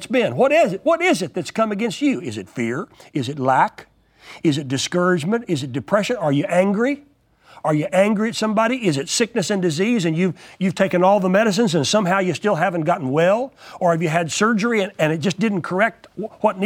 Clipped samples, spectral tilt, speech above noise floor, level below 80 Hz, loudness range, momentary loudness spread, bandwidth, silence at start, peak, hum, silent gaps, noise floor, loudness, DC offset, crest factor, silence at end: under 0.1%; -5 dB/octave; 31 dB; -62 dBFS; 3 LU; 8 LU; 16.5 kHz; 0 s; 0 dBFS; none; none; -50 dBFS; -19 LUFS; under 0.1%; 18 dB; 0 s